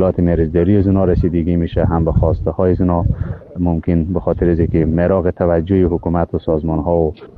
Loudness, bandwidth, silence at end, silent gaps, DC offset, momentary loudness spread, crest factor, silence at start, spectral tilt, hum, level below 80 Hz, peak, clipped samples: -16 LUFS; 4.5 kHz; 0.1 s; none; under 0.1%; 4 LU; 14 dB; 0 s; -12 dB/octave; none; -26 dBFS; -2 dBFS; under 0.1%